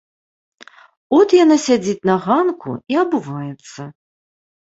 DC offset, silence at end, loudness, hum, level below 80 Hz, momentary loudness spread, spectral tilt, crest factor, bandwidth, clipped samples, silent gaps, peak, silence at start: under 0.1%; 0.75 s; -16 LUFS; none; -62 dBFS; 21 LU; -5.5 dB/octave; 16 dB; 8 kHz; under 0.1%; none; -2 dBFS; 1.1 s